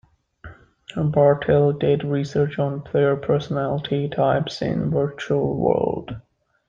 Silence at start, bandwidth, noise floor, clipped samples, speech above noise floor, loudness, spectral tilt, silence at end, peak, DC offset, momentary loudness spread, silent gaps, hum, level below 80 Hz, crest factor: 0.45 s; 7.6 kHz; -44 dBFS; under 0.1%; 24 dB; -21 LUFS; -8 dB/octave; 0.5 s; -4 dBFS; under 0.1%; 8 LU; none; none; -50 dBFS; 16 dB